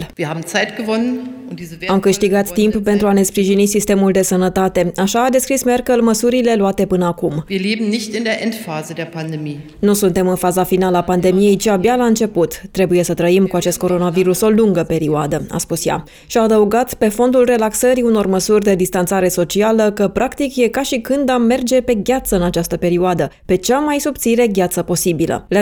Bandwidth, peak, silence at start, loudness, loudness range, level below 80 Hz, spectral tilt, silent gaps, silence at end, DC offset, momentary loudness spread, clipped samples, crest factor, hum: over 20 kHz; -2 dBFS; 0 s; -15 LUFS; 3 LU; -40 dBFS; -5 dB/octave; none; 0 s; under 0.1%; 7 LU; under 0.1%; 12 dB; none